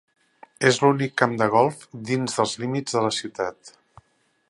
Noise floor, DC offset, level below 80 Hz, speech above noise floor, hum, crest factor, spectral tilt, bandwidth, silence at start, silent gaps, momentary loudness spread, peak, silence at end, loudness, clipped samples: -66 dBFS; under 0.1%; -66 dBFS; 43 dB; none; 24 dB; -4.5 dB/octave; 11.5 kHz; 0.6 s; none; 10 LU; 0 dBFS; 0.8 s; -23 LUFS; under 0.1%